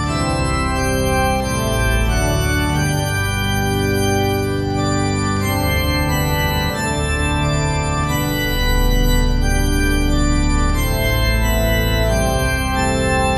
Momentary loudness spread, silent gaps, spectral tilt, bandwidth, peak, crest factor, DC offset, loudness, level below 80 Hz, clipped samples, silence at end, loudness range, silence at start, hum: 2 LU; none; -5 dB/octave; 13.5 kHz; -4 dBFS; 12 dB; under 0.1%; -18 LUFS; -22 dBFS; under 0.1%; 0 s; 1 LU; 0 s; none